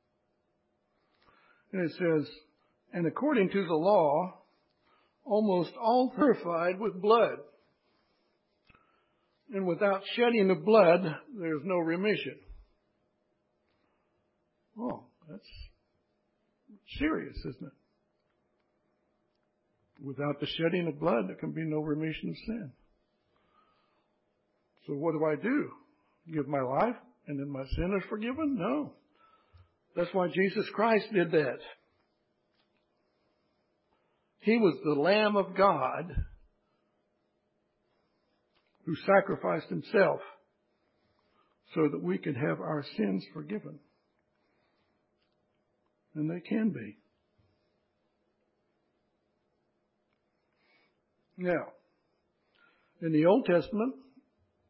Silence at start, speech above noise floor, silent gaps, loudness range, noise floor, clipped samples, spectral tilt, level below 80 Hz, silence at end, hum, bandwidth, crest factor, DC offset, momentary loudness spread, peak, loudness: 1.75 s; 48 dB; none; 13 LU; -77 dBFS; under 0.1%; -10 dB/octave; -56 dBFS; 0.7 s; none; 5.8 kHz; 24 dB; under 0.1%; 16 LU; -10 dBFS; -30 LUFS